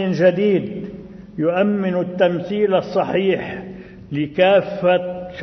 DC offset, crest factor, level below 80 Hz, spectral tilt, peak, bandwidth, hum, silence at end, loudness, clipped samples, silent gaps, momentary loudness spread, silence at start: under 0.1%; 16 dB; -52 dBFS; -8 dB/octave; -2 dBFS; 6.2 kHz; none; 0 s; -19 LUFS; under 0.1%; none; 17 LU; 0 s